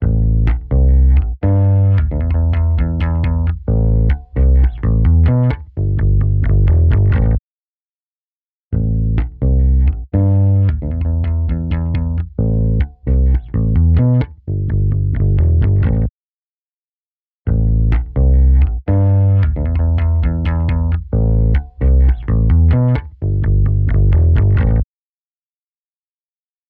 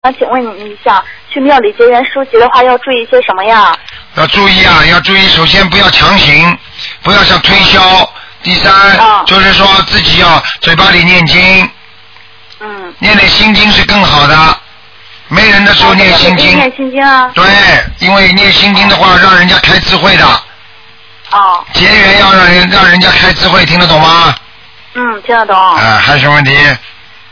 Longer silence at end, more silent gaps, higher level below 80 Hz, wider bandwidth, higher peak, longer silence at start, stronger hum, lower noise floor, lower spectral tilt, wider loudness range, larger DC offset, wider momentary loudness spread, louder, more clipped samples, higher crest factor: first, 1.85 s vs 0.4 s; first, 7.39-8.71 s, 16.10-17.45 s vs none; first, -16 dBFS vs -26 dBFS; second, 3.6 kHz vs 5.4 kHz; about the same, -2 dBFS vs 0 dBFS; about the same, 0 s vs 0.05 s; neither; first, under -90 dBFS vs -36 dBFS; first, -12 dB/octave vs -4.5 dB/octave; about the same, 3 LU vs 3 LU; neither; second, 7 LU vs 10 LU; second, -15 LUFS vs -4 LUFS; second, under 0.1% vs 7%; about the same, 10 dB vs 6 dB